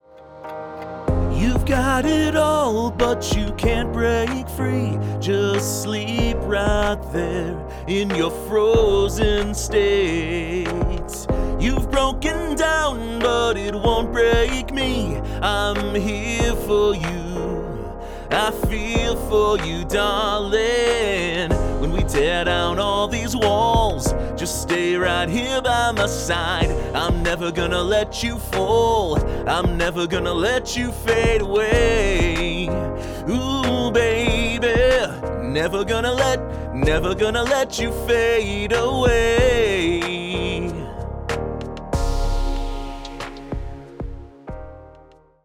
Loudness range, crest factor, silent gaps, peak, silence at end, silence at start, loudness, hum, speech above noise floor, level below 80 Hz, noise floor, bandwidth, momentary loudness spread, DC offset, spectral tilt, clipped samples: 3 LU; 16 dB; none; -4 dBFS; 0.5 s; 0.15 s; -21 LUFS; none; 30 dB; -28 dBFS; -49 dBFS; 19.5 kHz; 10 LU; under 0.1%; -5 dB/octave; under 0.1%